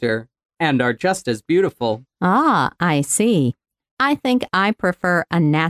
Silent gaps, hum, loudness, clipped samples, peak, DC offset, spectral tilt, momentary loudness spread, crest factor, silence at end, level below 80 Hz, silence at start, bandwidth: 0.45-0.49 s, 3.91-3.97 s; none; -19 LUFS; under 0.1%; -4 dBFS; under 0.1%; -5 dB/octave; 7 LU; 16 dB; 0 s; -56 dBFS; 0 s; 16 kHz